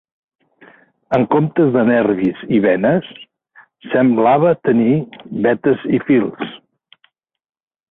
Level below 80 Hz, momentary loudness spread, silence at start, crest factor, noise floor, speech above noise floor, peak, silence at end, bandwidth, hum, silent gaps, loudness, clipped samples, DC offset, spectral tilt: -56 dBFS; 8 LU; 1.1 s; 14 dB; -60 dBFS; 46 dB; -2 dBFS; 1.35 s; 4 kHz; none; none; -15 LUFS; under 0.1%; under 0.1%; -10 dB/octave